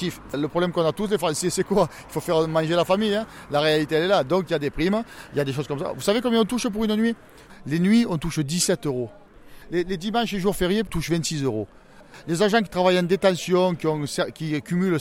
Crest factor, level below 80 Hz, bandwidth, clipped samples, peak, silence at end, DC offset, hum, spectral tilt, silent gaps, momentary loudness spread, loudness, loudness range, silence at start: 16 dB; -46 dBFS; 16.5 kHz; under 0.1%; -6 dBFS; 0 s; under 0.1%; none; -5 dB/octave; none; 8 LU; -23 LUFS; 3 LU; 0 s